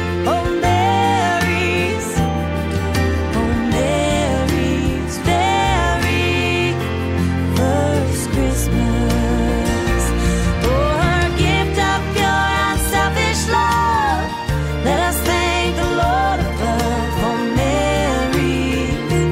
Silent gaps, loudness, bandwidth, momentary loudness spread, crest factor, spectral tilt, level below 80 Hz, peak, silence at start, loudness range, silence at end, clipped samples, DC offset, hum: none; -17 LUFS; 16 kHz; 4 LU; 12 dB; -5 dB/octave; -26 dBFS; -6 dBFS; 0 s; 2 LU; 0 s; under 0.1%; under 0.1%; none